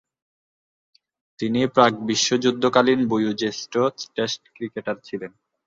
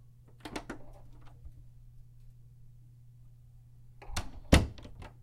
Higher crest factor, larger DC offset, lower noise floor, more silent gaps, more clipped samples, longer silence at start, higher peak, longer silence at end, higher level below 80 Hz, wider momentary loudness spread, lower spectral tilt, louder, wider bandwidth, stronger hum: second, 22 dB vs 30 dB; neither; first, under -90 dBFS vs -55 dBFS; neither; neither; first, 1.4 s vs 0 s; first, -2 dBFS vs -8 dBFS; first, 0.4 s vs 0 s; second, -64 dBFS vs -42 dBFS; second, 13 LU vs 30 LU; about the same, -4 dB/octave vs -5 dB/octave; first, -22 LUFS vs -32 LUFS; second, 7.8 kHz vs 16 kHz; neither